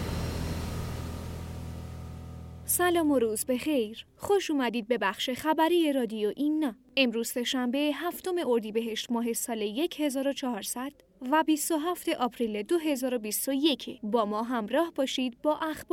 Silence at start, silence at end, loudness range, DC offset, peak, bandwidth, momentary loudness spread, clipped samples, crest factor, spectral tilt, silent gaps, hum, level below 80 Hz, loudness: 0 s; 0.1 s; 3 LU; under 0.1%; -10 dBFS; 17 kHz; 13 LU; under 0.1%; 18 dB; -4 dB/octave; none; none; -50 dBFS; -29 LUFS